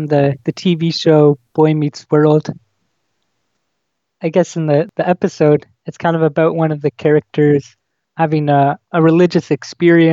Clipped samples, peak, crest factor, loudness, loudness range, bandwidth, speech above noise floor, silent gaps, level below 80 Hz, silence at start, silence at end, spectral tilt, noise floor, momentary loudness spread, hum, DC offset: under 0.1%; 0 dBFS; 14 dB; -14 LUFS; 4 LU; 7.6 kHz; 60 dB; none; -62 dBFS; 0 s; 0 s; -7.5 dB/octave; -73 dBFS; 7 LU; none; under 0.1%